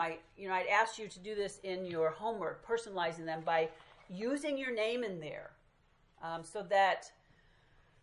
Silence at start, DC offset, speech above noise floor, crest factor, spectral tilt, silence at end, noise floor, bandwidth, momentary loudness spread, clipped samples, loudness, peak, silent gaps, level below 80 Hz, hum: 0 s; under 0.1%; 33 dB; 22 dB; -4 dB/octave; 0.9 s; -69 dBFS; 11 kHz; 15 LU; under 0.1%; -36 LUFS; -16 dBFS; none; -72 dBFS; none